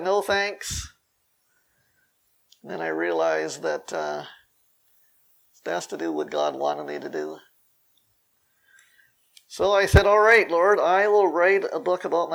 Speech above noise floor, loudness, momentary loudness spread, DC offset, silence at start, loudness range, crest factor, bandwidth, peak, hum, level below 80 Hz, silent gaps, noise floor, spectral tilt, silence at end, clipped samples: 48 dB; -22 LUFS; 17 LU; under 0.1%; 0 s; 12 LU; 24 dB; over 20 kHz; 0 dBFS; none; -40 dBFS; none; -70 dBFS; -5 dB/octave; 0 s; under 0.1%